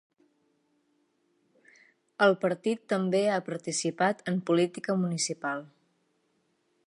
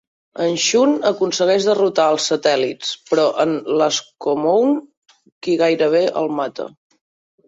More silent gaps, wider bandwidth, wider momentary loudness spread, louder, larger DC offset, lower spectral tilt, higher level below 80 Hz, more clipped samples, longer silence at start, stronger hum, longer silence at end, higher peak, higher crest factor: second, none vs 4.97-5.02 s, 5.32-5.41 s; first, 11.5 kHz vs 8 kHz; about the same, 7 LU vs 9 LU; second, -28 LUFS vs -17 LUFS; neither; about the same, -4.5 dB/octave vs -3.5 dB/octave; second, -80 dBFS vs -66 dBFS; neither; first, 2.2 s vs 0.35 s; neither; first, 1.2 s vs 0.8 s; second, -10 dBFS vs -2 dBFS; first, 22 dB vs 16 dB